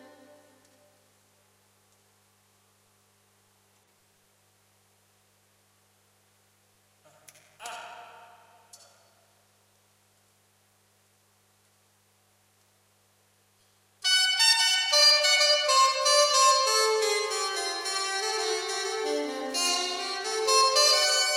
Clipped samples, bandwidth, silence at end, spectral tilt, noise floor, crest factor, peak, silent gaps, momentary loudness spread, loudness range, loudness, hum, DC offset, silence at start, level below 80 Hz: under 0.1%; 16 kHz; 0 s; 2 dB/octave; -66 dBFS; 20 dB; -8 dBFS; none; 12 LU; 8 LU; -22 LUFS; 50 Hz at -75 dBFS; under 0.1%; 7.6 s; -88 dBFS